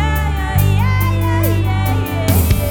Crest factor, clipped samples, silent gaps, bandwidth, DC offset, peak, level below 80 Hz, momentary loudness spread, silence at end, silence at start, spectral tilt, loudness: 12 dB; under 0.1%; none; over 20 kHz; 0.2%; -2 dBFS; -22 dBFS; 3 LU; 0 s; 0 s; -6 dB/octave; -16 LUFS